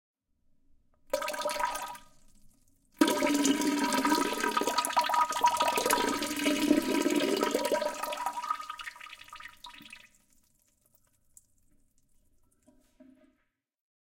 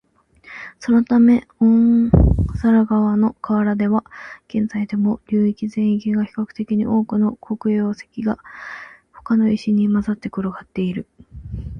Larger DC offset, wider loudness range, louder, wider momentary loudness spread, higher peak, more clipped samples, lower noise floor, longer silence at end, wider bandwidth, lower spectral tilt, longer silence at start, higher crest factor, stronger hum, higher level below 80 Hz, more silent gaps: neither; first, 13 LU vs 6 LU; second, -29 LUFS vs -19 LUFS; about the same, 19 LU vs 18 LU; second, -8 dBFS vs 0 dBFS; neither; first, -78 dBFS vs -47 dBFS; first, 1 s vs 0 s; first, 17 kHz vs 6.4 kHz; second, -2 dB/octave vs -9 dB/octave; first, 1.15 s vs 0.45 s; first, 24 dB vs 18 dB; neither; second, -64 dBFS vs -32 dBFS; neither